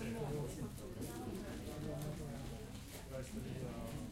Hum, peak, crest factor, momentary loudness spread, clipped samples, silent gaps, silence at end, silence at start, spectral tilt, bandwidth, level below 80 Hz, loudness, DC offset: none; -32 dBFS; 14 dB; 6 LU; under 0.1%; none; 0 s; 0 s; -6 dB/octave; 16 kHz; -54 dBFS; -46 LUFS; under 0.1%